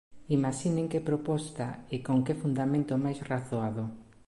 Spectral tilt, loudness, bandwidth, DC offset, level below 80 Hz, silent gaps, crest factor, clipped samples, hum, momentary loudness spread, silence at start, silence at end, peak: -7 dB/octave; -31 LUFS; 11.5 kHz; under 0.1%; -62 dBFS; none; 16 dB; under 0.1%; none; 8 LU; 0.1 s; 0.25 s; -16 dBFS